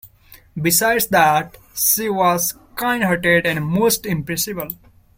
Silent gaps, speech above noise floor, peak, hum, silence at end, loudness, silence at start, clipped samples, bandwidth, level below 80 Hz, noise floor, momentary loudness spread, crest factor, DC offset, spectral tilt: none; 30 dB; -2 dBFS; none; 0.45 s; -17 LUFS; 0.05 s; under 0.1%; 16.5 kHz; -48 dBFS; -48 dBFS; 11 LU; 18 dB; under 0.1%; -3.5 dB/octave